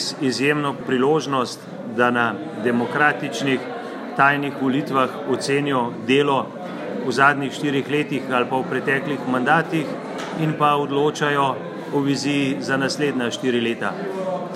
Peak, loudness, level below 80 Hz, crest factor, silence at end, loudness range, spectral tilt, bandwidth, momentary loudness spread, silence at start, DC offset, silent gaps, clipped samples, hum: 0 dBFS; -21 LUFS; -72 dBFS; 20 dB; 0 s; 1 LU; -5 dB/octave; 14 kHz; 9 LU; 0 s; under 0.1%; none; under 0.1%; none